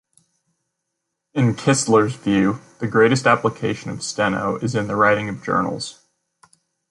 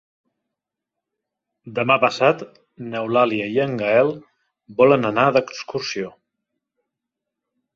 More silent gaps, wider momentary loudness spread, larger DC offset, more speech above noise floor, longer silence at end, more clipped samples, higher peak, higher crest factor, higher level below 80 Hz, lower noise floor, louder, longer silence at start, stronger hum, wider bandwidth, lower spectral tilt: neither; second, 11 LU vs 16 LU; neither; second, 59 dB vs 65 dB; second, 1 s vs 1.65 s; neither; about the same, -2 dBFS vs 0 dBFS; about the same, 18 dB vs 22 dB; first, -54 dBFS vs -64 dBFS; second, -78 dBFS vs -84 dBFS; about the same, -19 LUFS vs -19 LUFS; second, 1.35 s vs 1.65 s; neither; first, 11.5 kHz vs 7.6 kHz; about the same, -5 dB/octave vs -5.5 dB/octave